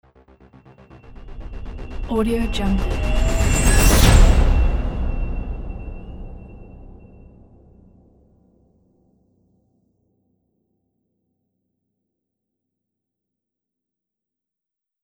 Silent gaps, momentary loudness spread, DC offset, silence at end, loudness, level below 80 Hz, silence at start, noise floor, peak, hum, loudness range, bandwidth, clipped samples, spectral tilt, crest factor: none; 26 LU; under 0.1%; 8.15 s; -19 LUFS; -24 dBFS; 1.1 s; -87 dBFS; 0 dBFS; none; 18 LU; over 20 kHz; under 0.1%; -5 dB/octave; 20 dB